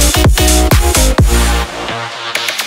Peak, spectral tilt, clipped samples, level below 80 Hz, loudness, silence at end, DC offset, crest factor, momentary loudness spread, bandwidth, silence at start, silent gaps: 0 dBFS; -3.5 dB/octave; under 0.1%; -14 dBFS; -12 LUFS; 0 s; under 0.1%; 10 dB; 10 LU; 16.5 kHz; 0 s; none